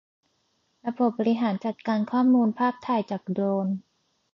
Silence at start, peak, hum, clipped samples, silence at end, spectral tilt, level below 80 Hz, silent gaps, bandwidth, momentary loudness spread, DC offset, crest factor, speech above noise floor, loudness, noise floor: 0.85 s; -12 dBFS; none; under 0.1%; 0.55 s; -8.5 dB/octave; -74 dBFS; none; 6 kHz; 10 LU; under 0.1%; 14 dB; 47 dB; -26 LUFS; -71 dBFS